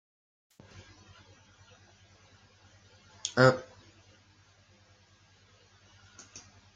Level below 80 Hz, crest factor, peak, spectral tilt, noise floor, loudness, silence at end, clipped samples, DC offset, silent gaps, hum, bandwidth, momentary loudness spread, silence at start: -72 dBFS; 30 dB; -6 dBFS; -5 dB/octave; -62 dBFS; -27 LUFS; 0.35 s; under 0.1%; under 0.1%; none; 50 Hz at -65 dBFS; 9.4 kHz; 31 LU; 3.25 s